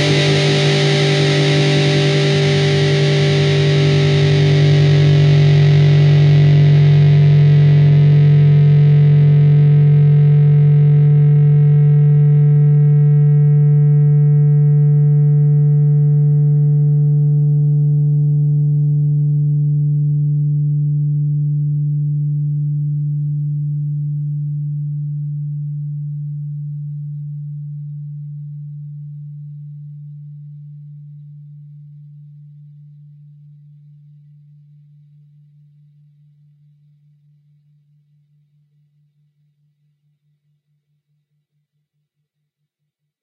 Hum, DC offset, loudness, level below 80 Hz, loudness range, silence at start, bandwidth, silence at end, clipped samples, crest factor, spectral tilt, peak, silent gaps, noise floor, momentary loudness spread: none; under 0.1%; -13 LUFS; -50 dBFS; 18 LU; 0 s; 7.2 kHz; 11.4 s; under 0.1%; 12 dB; -7.5 dB/octave; -2 dBFS; none; -76 dBFS; 17 LU